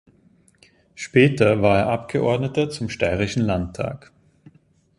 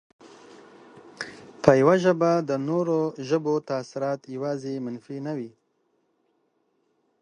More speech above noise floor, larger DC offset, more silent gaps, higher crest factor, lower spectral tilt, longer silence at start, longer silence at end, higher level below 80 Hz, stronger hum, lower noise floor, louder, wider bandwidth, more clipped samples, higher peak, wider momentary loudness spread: second, 37 dB vs 47 dB; neither; neither; second, 20 dB vs 26 dB; about the same, -6.5 dB/octave vs -7 dB/octave; first, 0.95 s vs 0.25 s; second, 1 s vs 1.75 s; first, -44 dBFS vs -68 dBFS; neither; second, -57 dBFS vs -71 dBFS; first, -21 LUFS vs -25 LUFS; first, 11.5 kHz vs 10 kHz; neither; about the same, -2 dBFS vs 0 dBFS; second, 13 LU vs 18 LU